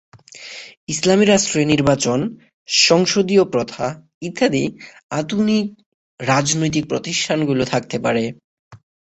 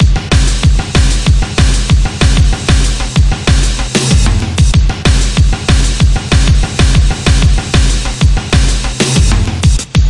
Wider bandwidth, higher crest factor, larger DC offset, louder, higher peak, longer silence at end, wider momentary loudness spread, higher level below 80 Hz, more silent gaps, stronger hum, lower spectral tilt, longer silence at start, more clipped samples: second, 8.4 kHz vs 11.5 kHz; first, 18 dB vs 8 dB; neither; second, -18 LUFS vs -11 LUFS; about the same, -2 dBFS vs 0 dBFS; first, 0.25 s vs 0 s; first, 15 LU vs 2 LU; second, -52 dBFS vs -12 dBFS; first, 0.77-0.87 s, 2.54-2.65 s, 4.14-4.21 s, 5.03-5.09 s, 5.86-6.18 s, 8.44-8.71 s vs none; neither; about the same, -4 dB/octave vs -4.5 dB/octave; first, 0.15 s vs 0 s; neither